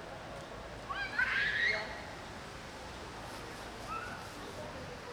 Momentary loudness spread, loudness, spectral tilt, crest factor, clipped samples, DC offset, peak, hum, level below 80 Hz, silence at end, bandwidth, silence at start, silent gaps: 15 LU; -38 LUFS; -3 dB/octave; 20 dB; under 0.1%; under 0.1%; -20 dBFS; none; -56 dBFS; 0 s; over 20 kHz; 0 s; none